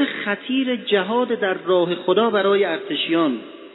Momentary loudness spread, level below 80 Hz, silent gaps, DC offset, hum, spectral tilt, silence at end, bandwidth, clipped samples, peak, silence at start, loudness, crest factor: 5 LU; -78 dBFS; none; under 0.1%; none; -8.5 dB/octave; 0 s; 4.1 kHz; under 0.1%; -4 dBFS; 0 s; -20 LUFS; 16 dB